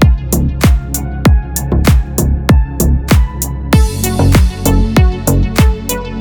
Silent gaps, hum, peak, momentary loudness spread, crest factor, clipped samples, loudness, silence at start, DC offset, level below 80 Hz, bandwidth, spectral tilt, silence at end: none; none; 0 dBFS; 5 LU; 10 dB; under 0.1%; -12 LUFS; 0 s; under 0.1%; -14 dBFS; over 20 kHz; -5.5 dB/octave; 0 s